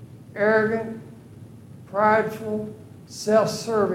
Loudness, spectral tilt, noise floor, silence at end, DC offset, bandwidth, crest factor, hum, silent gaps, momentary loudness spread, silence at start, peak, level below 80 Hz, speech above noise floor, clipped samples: -23 LUFS; -5 dB/octave; -44 dBFS; 0 s; under 0.1%; 16 kHz; 18 dB; none; none; 20 LU; 0 s; -6 dBFS; -64 dBFS; 22 dB; under 0.1%